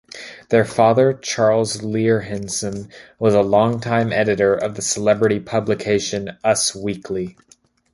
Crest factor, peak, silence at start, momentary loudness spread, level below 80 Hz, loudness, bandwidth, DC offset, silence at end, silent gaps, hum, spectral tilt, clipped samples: 18 dB; -2 dBFS; 0.15 s; 12 LU; -52 dBFS; -19 LUFS; 11.5 kHz; under 0.1%; 0.65 s; none; none; -4.5 dB/octave; under 0.1%